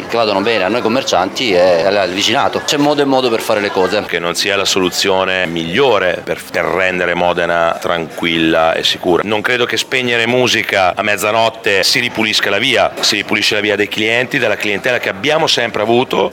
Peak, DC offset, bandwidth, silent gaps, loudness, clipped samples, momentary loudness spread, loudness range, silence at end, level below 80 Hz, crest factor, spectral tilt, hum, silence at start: 0 dBFS; under 0.1%; 19.5 kHz; none; -13 LUFS; under 0.1%; 3 LU; 2 LU; 0 s; -52 dBFS; 14 dB; -3 dB/octave; none; 0 s